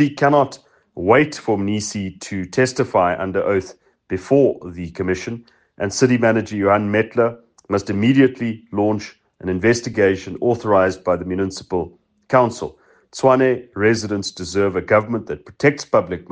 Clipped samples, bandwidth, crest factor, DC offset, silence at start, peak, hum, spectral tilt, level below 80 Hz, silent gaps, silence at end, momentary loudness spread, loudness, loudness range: under 0.1%; 9.8 kHz; 18 dB; under 0.1%; 0 s; 0 dBFS; none; -6 dB/octave; -56 dBFS; none; 0.1 s; 12 LU; -19 LUFS; 2 LU